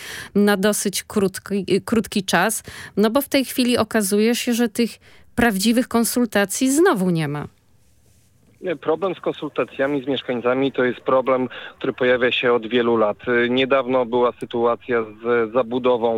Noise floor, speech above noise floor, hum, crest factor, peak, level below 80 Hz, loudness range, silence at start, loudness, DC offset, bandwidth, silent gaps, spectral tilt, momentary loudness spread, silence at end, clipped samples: -58 dBFS; 38 dB; none; 16 dB; -4 dBFS; -54 dBFS; 4 LU; 0 s; -20 LUFS; under 0.1%; 17 kHz; none; -4.5 dB/octave; 8 LU; 0 s; under 0.1%